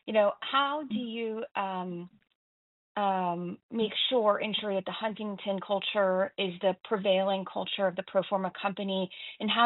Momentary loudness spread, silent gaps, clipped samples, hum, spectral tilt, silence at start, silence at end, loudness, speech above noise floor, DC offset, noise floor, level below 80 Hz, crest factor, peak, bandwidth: 9 LU; 2.35-2.95 s, 3.63-3.69 s; under 0.1%; none; -2.5 dB/octave; 0.05 s; 0 s; -30 LUFS; over 60 dB; under 0.1%; under -90 dBFS; -78 dBFS; 20 dB; -10 dBFS; 4.1 kHz